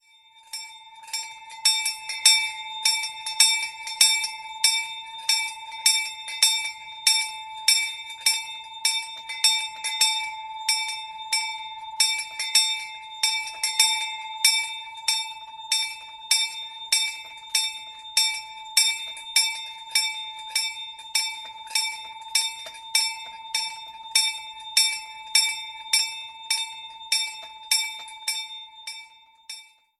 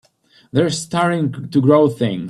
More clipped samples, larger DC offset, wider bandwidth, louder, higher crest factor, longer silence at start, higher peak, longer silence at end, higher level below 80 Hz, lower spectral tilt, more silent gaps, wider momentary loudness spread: neither; neither; first, 16 kHz vs 12.5 kHz; second, -23 LUFS vs -17 LUFS; first, 26 dB vs 16 dB; second, 0.35 s vs 0.55 s; about the same, 0 dBFS vs 0 dBFS; first, 0.35 s vs 0 s; second, -74 dBFS vs -58 dBFS; second, 5.5 dB/octave vs -6.5 dB/octave; neither; first, 16 LU vs 7 LU